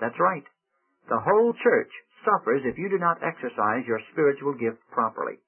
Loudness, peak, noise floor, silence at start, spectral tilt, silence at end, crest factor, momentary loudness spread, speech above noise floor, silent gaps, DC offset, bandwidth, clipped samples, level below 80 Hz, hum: -25 LUFS; -6 dBFS; -72 dBFS; 0 s; -11 dB/octave; 0.15 s; 18 dB; 8 LU; 48 dB; none; under 0.1%; 3.3 kHz; under 0.1%; -70 dBFS; none